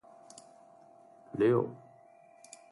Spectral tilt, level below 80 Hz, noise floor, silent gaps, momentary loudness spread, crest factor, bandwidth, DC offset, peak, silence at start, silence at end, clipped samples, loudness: -7.5 dB/octave; -76 dBFS; -59 dBFS; none; 25 LU; 20 dB; 11.5 kHz; under 0.1%; -16 dBFS; 1.35 s; 0.95 s; under 0.1%; -31 LUFS